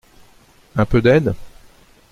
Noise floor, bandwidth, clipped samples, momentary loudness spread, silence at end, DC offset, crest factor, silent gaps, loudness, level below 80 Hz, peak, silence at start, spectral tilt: -50 dBFS; 13.5 kHz; under 0.1%; 13 LU; 0.65 s; under 0.1%; 18 dB; none; -17 LUFS; -36 dBFS; -2 dBFS; 0.75 s; -8 dB/octave